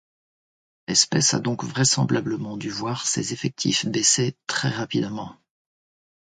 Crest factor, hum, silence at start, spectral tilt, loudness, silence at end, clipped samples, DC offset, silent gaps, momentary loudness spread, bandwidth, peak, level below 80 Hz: 22 dB; none; 0.9 s; -3 dB/octave; -22 LUFS; 1 s; under 0.1%; under 0.1%; none; 11 LU; 10 kHz; -2 dBFS; -60 dBFS